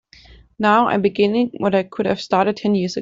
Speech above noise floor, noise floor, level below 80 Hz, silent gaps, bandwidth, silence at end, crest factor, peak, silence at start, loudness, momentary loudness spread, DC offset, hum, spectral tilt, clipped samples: 29 dB; -47 dBFS; -54 dBFS; none; 7.6 kHz; 0 s; 16 dB; -4 dBFS; 0.6 s; -18 LUFS; 5 LU; under 0.1%; none; -6.5 dB/octave; under 0.1%